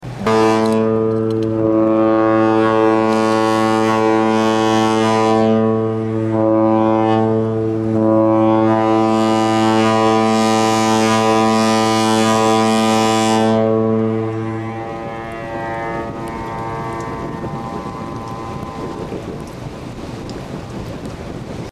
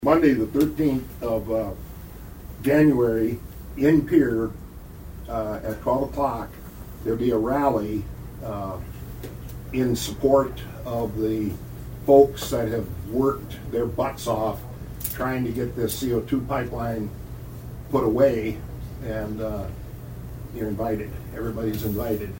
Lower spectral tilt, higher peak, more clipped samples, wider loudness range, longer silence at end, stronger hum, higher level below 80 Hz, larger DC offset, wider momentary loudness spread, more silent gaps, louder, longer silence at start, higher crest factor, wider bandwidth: second, -5.5 dB/octave vs -7 dB/octave; about the same, -2 dBFS vs -2 dBFS; neither; first, 12 LU vs 5 LU; about the same, 0 s vs 0 s; neither; about the same, -44 dBFS vs -40 dBFS; neither; second, 14 LU vs 19 LU; neither; first, -15 LUFS vs -24 LUFS; about the same, 0 s vs 0 s; second, 12 dB vs 22 dB; second, 14 kHz vs 16.5 kHz